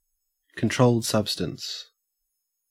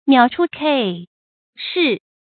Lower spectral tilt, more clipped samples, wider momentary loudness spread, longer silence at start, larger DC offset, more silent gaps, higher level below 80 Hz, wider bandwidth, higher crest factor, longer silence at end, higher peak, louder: second, -5 dB/octave vs -10 dB/octave; neither; about the same, 15 LU vs 13 LU; first, 0.55 s vs 0.05 s; neither; second, none vs 1.07-1.53 s; about the same, -60 dBFS vs -64 dBFS; first, 16 kHz vs 4.7 kHz; about the same, 22 dB vs 18 dB; first, 0.85 s vs 0.3 s; second, -4 dBFS vs 0 dBFS; second, -25 LUFS vs -18 LUFS